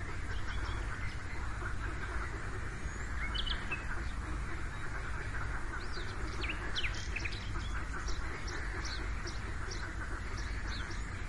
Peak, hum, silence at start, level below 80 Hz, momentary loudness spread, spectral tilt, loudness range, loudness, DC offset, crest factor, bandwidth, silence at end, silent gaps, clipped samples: -22 dBFS; none; 0 s; -40 dBFS; 5 LU; -4 dB/octave; 1 LU; -40 LUFS; 0.4%; 16 dB; 11.5 kHz; 0 s; none; under 0.1%